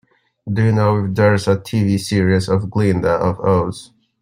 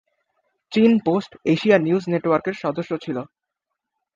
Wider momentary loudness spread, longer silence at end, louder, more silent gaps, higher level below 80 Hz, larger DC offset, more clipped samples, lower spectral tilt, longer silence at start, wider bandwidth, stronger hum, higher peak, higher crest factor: second, 6 LU vs 11 LU; second, 0.35 s vs 0.9 s; first, -17 LUFS vs -21 LUFS; neither; first, -48 dBFS vs -64 dBFS; neither; neither; about the same, -7 dB/octave vs -7.5 dB/octave; second, 0.45 s vs 0.7 s; first, 15 kHz vs 7.4 kHz; neither; about the same, -2 dBFS vs -2 dBFS; second, 14 dB vs 20 dB